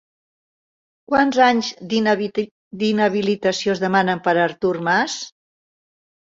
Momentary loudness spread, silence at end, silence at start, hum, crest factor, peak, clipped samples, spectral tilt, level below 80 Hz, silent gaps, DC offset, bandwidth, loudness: 9 LU; 1 s; 1.1 s; none; 18 dB; -2 dBFS; under 0.1%; -4.5 dB/octave; -60 dBFS; 2.51-2.71 s; under 0.1%; 7.8 kHz; -19 LUFS